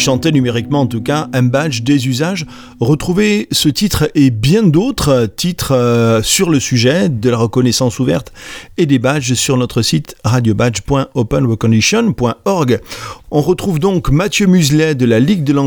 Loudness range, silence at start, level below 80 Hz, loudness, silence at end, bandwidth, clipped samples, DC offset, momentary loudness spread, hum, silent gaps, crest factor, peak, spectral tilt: 2 LU; 0 s; -34 dBFS; -13 LUFS; 0 s; over 20 kHz; under 0.1%; under 0.1%; 6 LU; none; none; 12 dB; 0 dBFS; -5 dB/octave